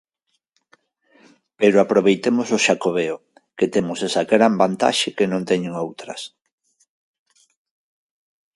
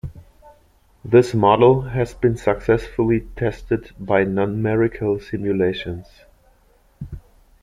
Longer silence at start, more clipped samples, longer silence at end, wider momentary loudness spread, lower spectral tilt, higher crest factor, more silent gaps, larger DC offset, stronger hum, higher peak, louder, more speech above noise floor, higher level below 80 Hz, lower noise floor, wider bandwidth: first, 1.6 s vs 0.05 s; neither; first, 2.3 s vs 0.45 s; second, 14 LU vs 22 LU; second, -4.5 dB/octave vs -8 dB/octave; about the same, 20 dB vs 18 dB; neither; neither; neither; about the same, 0 dBFS vs -2 dBFS; about the same, -19 LUFS vs -19 LUFS; first, 55 dB vs 37 dB; second, -64 dBFS vs -42 dBFS; first, -74 dBFS vs -56 dBFS; about the same, 11.5 kHz vs 10.5 kHz